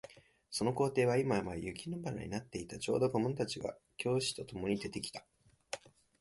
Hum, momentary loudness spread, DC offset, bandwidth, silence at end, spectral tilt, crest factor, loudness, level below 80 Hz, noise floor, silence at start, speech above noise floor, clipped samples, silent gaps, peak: none; 14 LU; under 0.1%; 11.5 kHz; 0.3 s; -5 dB/octave; 18 dB; -37 LUFS; -62 dBFS; -57 dBFS; 0.05 s; 21 dB; under 0.1%; none; -18 dBFS